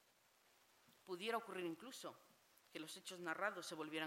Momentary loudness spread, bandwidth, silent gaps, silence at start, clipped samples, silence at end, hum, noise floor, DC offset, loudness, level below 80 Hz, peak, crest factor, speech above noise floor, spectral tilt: 12 LU; 16 kHz; none; 0.9 s; under 0.1%; 0 s; none; -76 dBFS; under 0.1%; -48 LUFS; under -90 dBFS; -28 dBFS; 22 dB; 28 dB; -3 dB/octave